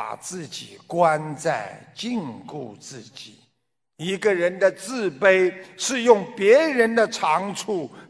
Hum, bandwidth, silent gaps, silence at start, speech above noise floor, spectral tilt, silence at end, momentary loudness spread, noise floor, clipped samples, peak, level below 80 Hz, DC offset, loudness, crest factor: none; 11 kHz; none; 0 s; 54 dB; -4 dB/octave; 0.05 s; 19 LU; -77 dBFS; under 0.1%; -2 dBFS; -70 dBFS; under 0.1%; -21 LUFS; 22 dB